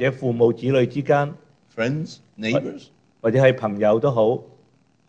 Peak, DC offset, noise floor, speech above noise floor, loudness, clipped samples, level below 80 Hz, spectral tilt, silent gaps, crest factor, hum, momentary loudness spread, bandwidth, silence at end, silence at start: -4 dBFS; under 0.1%; -59 dBFS; 39 dB; -21 LUFS; under 0.1%; -60 dBFS; -7.5 dB/octave; none; 18 dB; none; 12 LU; 8.4 kHz; 0.65 s; 0 s